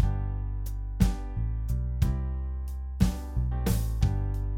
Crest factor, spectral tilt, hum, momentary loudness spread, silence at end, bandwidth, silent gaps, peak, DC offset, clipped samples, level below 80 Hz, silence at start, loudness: 20 dB; -7 dB/octave; none; 7 LU; 0 s; 17 kHz; none; -8 dBFS; under 0.1%; under 0.1%; -30 dBFS; 0 s; -31 LUFS